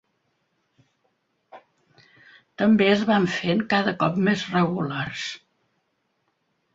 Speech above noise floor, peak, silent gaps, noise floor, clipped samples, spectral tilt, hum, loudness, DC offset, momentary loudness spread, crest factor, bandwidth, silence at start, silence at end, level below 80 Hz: 51 dB; -6 dBFS; none; -73 dBFS; under 0.1%; -6 dB/octave; none; -22 LUFS; under 0.1%; 11 LU; 20 dB; 7.8 kHz; 1.55 s; 1.35 s; -64 dBFS